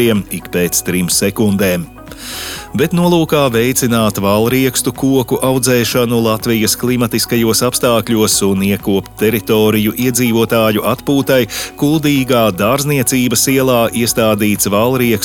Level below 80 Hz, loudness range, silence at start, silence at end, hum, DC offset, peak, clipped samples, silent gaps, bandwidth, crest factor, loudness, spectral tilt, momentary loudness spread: -40 dBFS; 2 LU; 0 s; 0 s; none; under 0.1%; 0 dBFS; under 0.1%; none; 19 kHz; 12 dB; -13 LUFS; -4.5 dB/octave; 4 LU